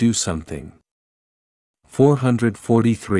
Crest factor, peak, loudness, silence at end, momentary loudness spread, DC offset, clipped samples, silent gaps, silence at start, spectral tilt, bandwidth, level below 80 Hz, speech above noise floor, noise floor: 18 dB; -2 dBFS; -19 LUFS; 0 s; 16 LU; under 0.1%; under 0.1%; 0.91-1.74 s; 0 s; -6 dB/octave; 12 kHz; -50 dBFS; over 72 dB; under -90 dBFS